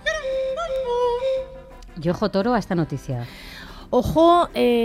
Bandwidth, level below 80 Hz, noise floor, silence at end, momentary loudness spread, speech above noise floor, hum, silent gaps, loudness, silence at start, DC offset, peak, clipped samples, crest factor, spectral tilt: 15.5 kHz; -42 dBFS; -40 dBFS; 0 s; 21 LU; 21 dB; none; none; -22 LUFS; 0 s; under 0.1%; -6 dBFS; under 0.1%; 16 dB; -6.5 dB/octave